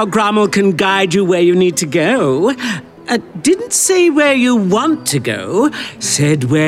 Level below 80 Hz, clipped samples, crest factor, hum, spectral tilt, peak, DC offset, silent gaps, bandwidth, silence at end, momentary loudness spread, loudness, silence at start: -56 dBFS; under 0.1%; 10 dB; none; -4 dB/octave; -4 dBFS; under 0.1%; none; 15.5 kHz; 0 s; 8 LU; -13 LUFS; 0 s